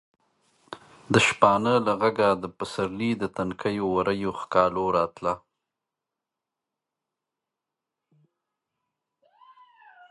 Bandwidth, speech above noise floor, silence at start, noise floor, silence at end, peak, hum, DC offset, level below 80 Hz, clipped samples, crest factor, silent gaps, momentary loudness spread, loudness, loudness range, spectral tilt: 11.5 kHz; 63 dB; 0.7 s; -87 dBFS; 4.75 s; -2 dBFS; none; under 0.1%; -58 dBFS; under 0.1%; 24 dB; none; 13 LU; -24 LUFS; 9 LU; -5 dB/octave